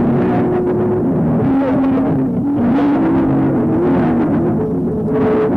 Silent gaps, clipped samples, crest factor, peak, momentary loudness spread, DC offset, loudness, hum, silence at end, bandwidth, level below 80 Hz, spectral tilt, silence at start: none; under 0.1%; 8 dB; -6 dBFS; 3 LU; under 0.1%; -15 LUFS; none; 0 s; 4.6 kHz; -38 dBFS; -10.5 dB/octave; 0 s